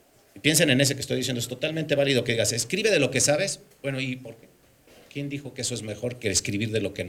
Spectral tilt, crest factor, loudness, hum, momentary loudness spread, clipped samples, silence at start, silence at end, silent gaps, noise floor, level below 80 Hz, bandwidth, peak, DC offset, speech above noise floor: -3.5 dB/octave; 20 dB; -25 LUFS; none; 13 LU; under 0.1%; 0.35 s; 0 s; none; -55 dBFS; -60 dBFS; 17 kHz; -6 dBFS; under 0.1%; 30 dB